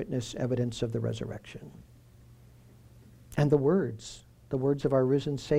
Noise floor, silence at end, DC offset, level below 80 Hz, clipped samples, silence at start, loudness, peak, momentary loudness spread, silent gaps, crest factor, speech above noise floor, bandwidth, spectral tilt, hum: -55 dBFS; 0 s; under 0.1%; -54 dBFS; under 0.1%; 0 s; -29 LUFS; -12 dBFS; 20 LU; none; 18 dB; 26 dB; 14 kHz; -7 dB/octave; none